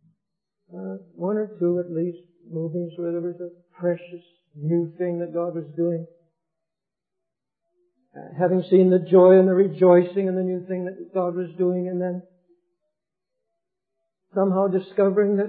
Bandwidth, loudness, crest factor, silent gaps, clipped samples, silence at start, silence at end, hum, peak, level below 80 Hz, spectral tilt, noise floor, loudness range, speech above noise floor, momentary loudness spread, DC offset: 4.2 kHz; -22 LUFS; 18 dB; none; under 0.1%; 0.75 s; 0 s; none; -4 dBFS; -86 dBFS; -13 dB/octave; -88 dBFS; 11 LU; 66 dB; 16 LU; under 0.1%